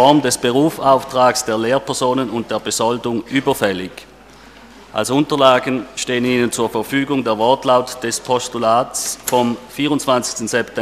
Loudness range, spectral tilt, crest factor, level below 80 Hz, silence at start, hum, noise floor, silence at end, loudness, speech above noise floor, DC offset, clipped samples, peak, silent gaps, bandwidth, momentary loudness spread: 3 LU; -4 dB/octave; 16 dB; -52 dBFS; 0 s; none; -42 dBFS; 0 s; -17 LUFS; 25 dB; under 0.1%; under 0.1%; 0 dBFS; none; 15.5 kHz; 8 LU